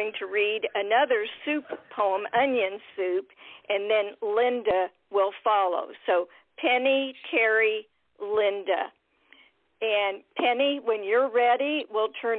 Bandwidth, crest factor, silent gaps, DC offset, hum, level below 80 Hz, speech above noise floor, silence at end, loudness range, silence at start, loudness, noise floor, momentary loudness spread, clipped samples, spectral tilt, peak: 4.4 kHz; 16 dB; none; under 0.1%; none; -72 dBFS; 33 dB; 0 s; 2 LU; 0 s; -26 LUFS; -59 dBFS; 8 LU; under 0.1%; -7 dB/octave; -12 dBFS